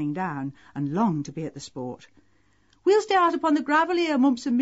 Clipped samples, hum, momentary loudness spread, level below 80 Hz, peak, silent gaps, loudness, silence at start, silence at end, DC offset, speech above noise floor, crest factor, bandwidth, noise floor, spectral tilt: under 0.1%; none; 15 LU; -66 dBFS; -10 dBFS; none; -24 LUFS; 0 s; 0 s; under 0.1%; 40 dB; 14 dB; 8 kHz; -64 dBFS; -4.5 dB/octave